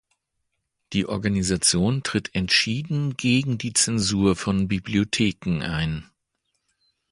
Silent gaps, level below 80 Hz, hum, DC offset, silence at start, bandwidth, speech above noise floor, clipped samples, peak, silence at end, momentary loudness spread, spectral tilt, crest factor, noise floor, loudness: none; -46 dBFS; none; under 0.1%; 0.9 s; 11.5 kHz; 54 dB; under 0.1%; -4 dBFS; 1.1 s; 7 LU; -4 dB/octave; 20 dB; -77 dBFS; -23 LUFS